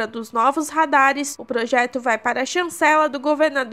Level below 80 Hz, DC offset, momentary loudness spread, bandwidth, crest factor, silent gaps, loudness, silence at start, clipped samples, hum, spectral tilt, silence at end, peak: -70 dBFS; 0.1%; 8 LU; 16 kHz; 18 dB; none; -19 LUFS; 0 s; under 0.1%; none; -2 dB/octave; 0 s; -2 dBFS